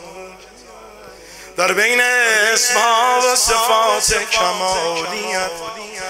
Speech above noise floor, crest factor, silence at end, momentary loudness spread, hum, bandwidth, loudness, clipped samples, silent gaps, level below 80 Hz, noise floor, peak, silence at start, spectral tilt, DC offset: 24 dB; 18 dB; 0 s; 13 LU; none; 16 kHz; -14 LUFS; under 0.1%; none; -44 dBFS; -40 dBFS; 0 dBFS; 0 s; 0 dB/octave; under 0.1%